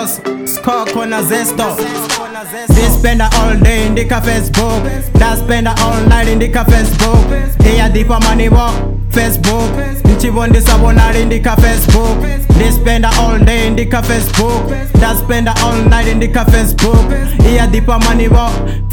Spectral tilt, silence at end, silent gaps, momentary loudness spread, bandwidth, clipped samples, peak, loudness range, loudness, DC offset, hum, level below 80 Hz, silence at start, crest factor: -5.5 dB/octave; 0 s; none; 6 LU; 19 kHz; 1%; 0 dBFS; 2 LU; -11 LUFS; under 0.1%; none; -12 dBFS; 0 s; 8 dB